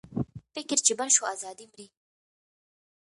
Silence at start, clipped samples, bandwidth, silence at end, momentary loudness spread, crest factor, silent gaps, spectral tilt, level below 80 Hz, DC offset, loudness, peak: 0.1 s; under 0.1%; 11.5 kHz; 1.3 s; 18 LU; 24 dB; none; -2 dB/octave; -62 dBFS; under 0.1%; -25 LUFS; -8 dBFS